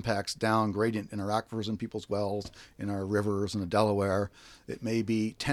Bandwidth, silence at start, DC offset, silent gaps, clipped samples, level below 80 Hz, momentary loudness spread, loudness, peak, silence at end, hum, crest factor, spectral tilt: 14.5 kHz; 0 s; under 0.1%; none; under 0.1%; -58 dBFS; 11 LU; -31 LUFS; -10 dBFS; 0 s; none; 20 dB; -6 dB/octave